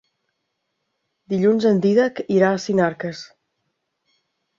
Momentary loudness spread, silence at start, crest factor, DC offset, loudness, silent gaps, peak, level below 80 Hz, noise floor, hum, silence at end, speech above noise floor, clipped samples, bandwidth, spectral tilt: 13 LU; 1.3 s; 18 dB; under 0.1%; -19 LUFS; none; -4 dBFS; -64 dBFS; -76 dBFS; none; 1.3 s; 57 dB; under 0.1%; 7.6 kHz; -7 dB/octave